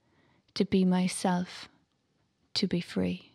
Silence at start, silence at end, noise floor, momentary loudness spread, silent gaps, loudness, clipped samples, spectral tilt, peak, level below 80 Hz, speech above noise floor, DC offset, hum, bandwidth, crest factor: 0.55 s; 0.15 s; -74 dBFS; 16 LU; none; -30 LUFS; under 0.1%; -5.5 dB/octave; -14 dBFS; -64 dBFS; 45 dB; under 0.1%; none; 12.5 kHz; 18 dB